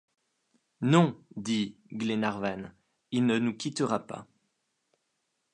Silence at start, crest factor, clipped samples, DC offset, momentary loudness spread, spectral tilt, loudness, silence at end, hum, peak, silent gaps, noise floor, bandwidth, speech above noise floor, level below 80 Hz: 0.8 s; 24 dB; under 0.1%; under 0.1%; 16 LU; -6 dB/octave; -29 LUFS; 1.3 s; none; -8 dBFS; none; -79 dBFS; 10 kHz; 50 dB; -70 dBFS